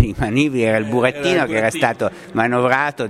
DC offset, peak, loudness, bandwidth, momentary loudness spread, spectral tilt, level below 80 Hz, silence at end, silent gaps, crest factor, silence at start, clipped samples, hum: under 0.1%; 0 dBFS; -18 LUFS; 15 kHz; 4 LU; -5.5 dB/octave; -40 dBFS; 0 s; none; 18 dB; 0 s; under 0.1%; none